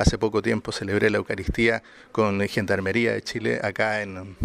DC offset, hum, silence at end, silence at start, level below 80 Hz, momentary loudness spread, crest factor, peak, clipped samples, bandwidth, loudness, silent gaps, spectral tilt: under 0.1%; none; 0 s; 0 s; -40 dBFS; 6 LU; 18 dB; -6 dBFS; under 0.1%; 15 kHz; -24 LUFS; none; -5.5 dB/octave